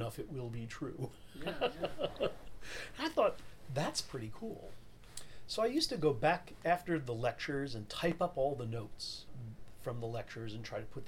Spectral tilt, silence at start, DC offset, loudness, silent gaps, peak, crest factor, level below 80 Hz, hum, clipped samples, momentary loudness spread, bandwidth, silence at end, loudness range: -5 dB/octave; 0 s; under 0.1%; -38 LUFS; none; -18 dBFS; 20 dB; -58 dBFS; none; under 0.1%; 16 LU; 17 kHz; 0 s; 5 LU